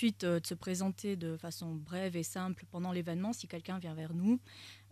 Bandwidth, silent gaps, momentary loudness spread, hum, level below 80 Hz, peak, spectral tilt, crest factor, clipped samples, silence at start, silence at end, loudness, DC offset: 14.5 kHz; none; 9 LU; none; -76 dBFS; -20 dBFS; -5.5 dB/octave; 18 dB; under 0.1%; 0 s; 0 s; -38 LUFS; under 0.1%